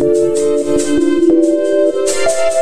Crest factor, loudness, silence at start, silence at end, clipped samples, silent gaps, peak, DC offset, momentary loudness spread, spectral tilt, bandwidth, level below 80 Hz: 10 dB; -13 LUFS; 0 s; 0 s; under 0.1%; none; -2 dBFS; under 0.1%; 3 LU; -4 dB/octave; 13 kHz; -42 dBFS